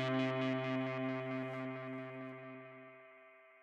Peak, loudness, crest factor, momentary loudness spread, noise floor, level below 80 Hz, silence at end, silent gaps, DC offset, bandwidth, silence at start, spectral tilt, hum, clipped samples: -24 dBFS; -40 LUFS; 18 dB; 22 LU; -61 dBFS; under -90 dBFS; 0 s; none; under 0.1%; 7.8 kHz; 0 s; -7.5 dB/octave; none; under 0.1%